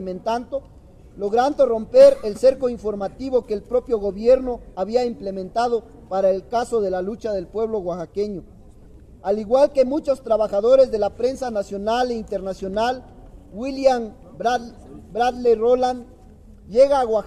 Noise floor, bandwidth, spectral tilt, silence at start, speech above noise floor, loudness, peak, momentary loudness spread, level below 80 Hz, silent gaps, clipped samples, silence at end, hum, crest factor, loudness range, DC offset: -45 dBFS; 11 kHz; -5.5 dB/octave; 0 s; 25 dB; -21 LUFS; -2 dBFS; 12 LU; -46 dBFS; none; under 0.1%; 0 s; none; 18 dB; 6 LU; under 0.1%